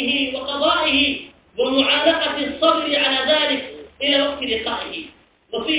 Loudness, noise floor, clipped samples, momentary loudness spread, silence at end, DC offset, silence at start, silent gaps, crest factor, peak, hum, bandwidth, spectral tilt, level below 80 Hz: -18 LUFS; -46 dBFS; under 0.1%; 13 LU; 0 s; under 0.1%; 0 s; none; 18 dB; -4 dBFS; none; 4 kHz; -7 dB/octave; -50 dBFS